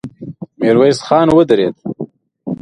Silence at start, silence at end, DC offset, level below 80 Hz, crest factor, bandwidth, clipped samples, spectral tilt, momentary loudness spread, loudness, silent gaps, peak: 0.05 s; 0 s; under 0.1%; -48 dBFS; 14 dB; 11 kHz; under 0.1%; -6.5 dB/octave; 20 LU; -12 LUFS; none; 0 dBFS